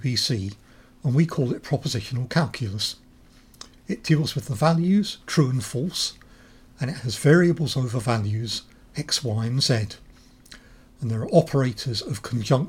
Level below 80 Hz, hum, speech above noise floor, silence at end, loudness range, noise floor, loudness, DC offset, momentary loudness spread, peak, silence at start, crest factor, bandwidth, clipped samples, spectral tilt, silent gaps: -52 dBFS; none; 29 dB; 0 s; 4 LU; -52 dBFS; -24 LUFS; under 0.1%; 13 LU; -4 dBFS; 0 s; 20 dB; 16.5 kHz; under 0.1%; -5.5 dB/octave; none